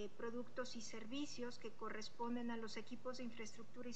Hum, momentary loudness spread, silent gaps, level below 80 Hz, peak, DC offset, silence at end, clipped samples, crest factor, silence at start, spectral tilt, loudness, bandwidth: none; 6 LU; none; -84 dBFS; -32 dBFS; 0.5%; 0 s; under 0.1%; 16 dB; 0 s; -4 dB/octave; -49 LUFS; 8.8 kHz